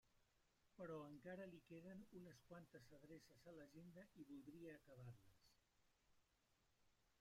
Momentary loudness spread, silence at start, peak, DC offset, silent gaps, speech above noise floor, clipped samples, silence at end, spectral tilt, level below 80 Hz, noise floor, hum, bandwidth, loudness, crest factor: 8 LU; 0.05 s; -46 dBFS; under 0.1%; none; 23 dB; under 0.1%; 0 s; -6.5 dB/octave; -86 dBFS; -84 dBFS; none; 15.5 kHz; -62 LUFS; 18 dB